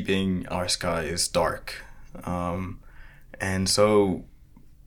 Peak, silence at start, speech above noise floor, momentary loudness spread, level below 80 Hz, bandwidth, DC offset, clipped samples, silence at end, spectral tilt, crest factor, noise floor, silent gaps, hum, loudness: -8 dBFS; 0 s; 25 dB; 18 LU; -46 dBFS; 18 kHz; under 0.1%; under 0.1%; 0.15 s; -4 dB/octave; 20 dB; -50 dBFS; none; none; -25 LUFS